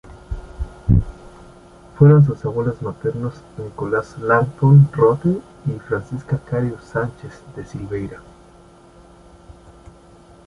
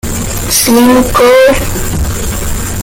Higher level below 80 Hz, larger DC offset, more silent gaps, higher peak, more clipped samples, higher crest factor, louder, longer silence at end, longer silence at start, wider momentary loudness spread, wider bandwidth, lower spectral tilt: second, -36 dBFS vs -20 dBFS; neither; neither; about the same, -2 dBFS vs 0 dBFS; neither; first, 18 dB vs 10 dB; second, -18 LUFS vs -9 LUFS; first, 2.25 s vs 0 s; about the same, 0.05 s vs 0.05 s; first, 22 LU vs 11 LU; second, 6.4 kHz vs 17.5 kHz; first, -10 dB/octave vs -4 dB/octave